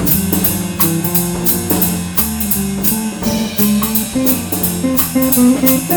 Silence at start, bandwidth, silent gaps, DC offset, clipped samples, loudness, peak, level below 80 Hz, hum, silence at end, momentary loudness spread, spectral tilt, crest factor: 0 s; over 20 kHz; none; under 0.1%; under 0.1%; -13 LUFS; 0 dBFS; -36 dBFS; none; 0 s; 5 LU; -4.5 dB/octave; 14 dB